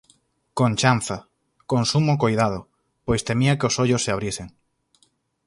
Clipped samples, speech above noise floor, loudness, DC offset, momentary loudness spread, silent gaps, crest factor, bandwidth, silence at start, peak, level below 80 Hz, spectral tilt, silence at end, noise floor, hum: under 0.1%; 44 dB; -22 LUFS; under 0.1%; 14 LU; none; 20 dB; 11.5 kHz; 0.55 s; -2 dBFS; -48 dBFS; -5 dB/octave; 1 s; -65 dBFS; none